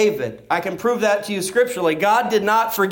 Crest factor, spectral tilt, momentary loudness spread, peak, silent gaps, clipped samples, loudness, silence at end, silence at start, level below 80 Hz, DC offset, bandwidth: 12 dB; -4 dB/octave; 6 LU; -6 dBFS; none; under 0.1%; -19 LUFS; 0 s; 0 s; -62 dBFS; under 0.1%; 17 kHz